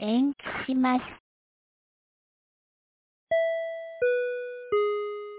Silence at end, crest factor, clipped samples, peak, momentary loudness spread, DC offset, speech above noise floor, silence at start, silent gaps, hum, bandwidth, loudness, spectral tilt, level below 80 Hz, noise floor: 0 s; 16 dB; under 0.1%; -14 dBFS; 8 LU; under 0.1%; over 64 dB; 0 s; 1.20-3.27 s; none; 4 kHz; -28 LUFS; -8.5 dB/octave; -66 dBFS; under -90 dBFS